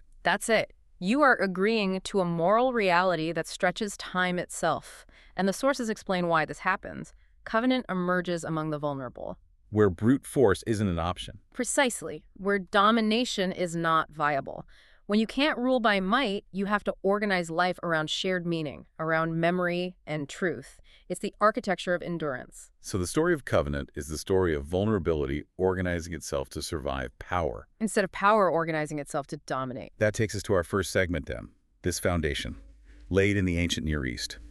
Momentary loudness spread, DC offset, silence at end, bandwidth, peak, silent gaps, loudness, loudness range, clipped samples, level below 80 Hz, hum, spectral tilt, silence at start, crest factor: 12 LU; under 0.1%; 0 s; 13.5 kHz; -8 dBFS; none; -28 LUFS; 4 LU; under 0.1%; -48 dBFS; none; -5 dB/octave; 0.15 s; 20 dB